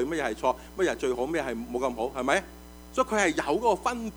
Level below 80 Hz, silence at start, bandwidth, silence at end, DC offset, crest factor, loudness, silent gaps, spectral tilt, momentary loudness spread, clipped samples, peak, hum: -50 dBFS; 0 s; over 20 kHz; 0 s; under 0.1%; 20 dB; -28 LUFS; none; -4 dB/octave; 6 LU; under 0.1%; -10 dBFS; none